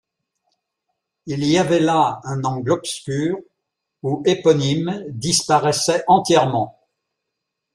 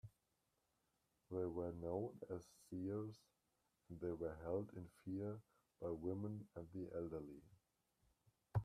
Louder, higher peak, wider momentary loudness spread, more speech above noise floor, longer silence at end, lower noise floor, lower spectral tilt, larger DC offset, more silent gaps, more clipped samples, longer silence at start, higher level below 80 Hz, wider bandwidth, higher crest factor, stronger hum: first, -19 LUFS vs -49 LUFS; first, -2 dBFS vs -30 dBFS; about the same, 10 LU vs 9 LU; first, 61 dB vs 38 dB; first, 1.05 s vs 0 s; second, -80 dBFS vs -87 dBFS; second, -4.5 dB/octave vs -9 dB/octave; neither; neither; neither; first, 1.25 s vs 0.05 s; first, -58 dBFS vs -72 dBFS; about the same, 14 kHz vs 14 kHz; about the same, 18 dB vs 20 dB; neither